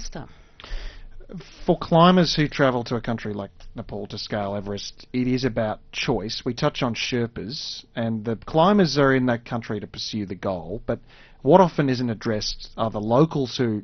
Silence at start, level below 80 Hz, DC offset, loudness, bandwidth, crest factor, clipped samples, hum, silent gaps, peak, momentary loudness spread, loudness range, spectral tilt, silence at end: 0 s; -42 dBFS; under 0.1%; -23 LUFS; 6.6 kHz; 22 dB; under 0.1%; none; none; 0 dBFS; 17 LU; 4 LU; -5 dB/octave; 0 s